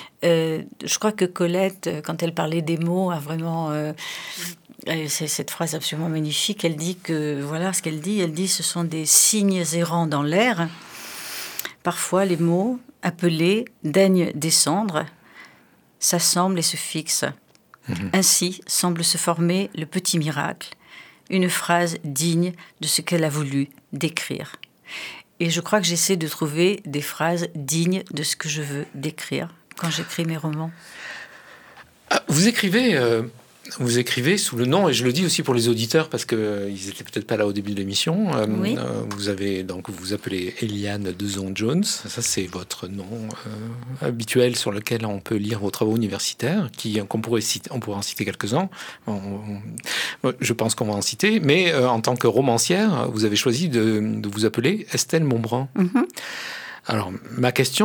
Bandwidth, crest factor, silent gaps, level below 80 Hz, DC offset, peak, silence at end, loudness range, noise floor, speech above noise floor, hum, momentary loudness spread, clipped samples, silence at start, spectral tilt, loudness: over 20 kHz; 22 dB; none; -66 dBFS; under 0.1%; 0 dBFS; 0 s; 6 LU; -55 dBFS; 33 dB; none; 12 LU; under 0.1%; 0 s; -4 dB/octave; -22 LUFS